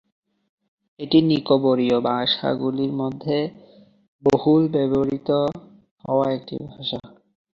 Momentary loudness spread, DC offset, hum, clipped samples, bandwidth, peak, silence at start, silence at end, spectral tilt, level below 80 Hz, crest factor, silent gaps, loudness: 12 LU; under 0.1%; none; under 0.1%; 7.2 kHz; -4 dBFS; 1 s; 0.5 s; -7.5 dB/octave; -58 dBFS; 18 dB; 4.08-4.19 s, 5.91-5.96 s; -21 LUFS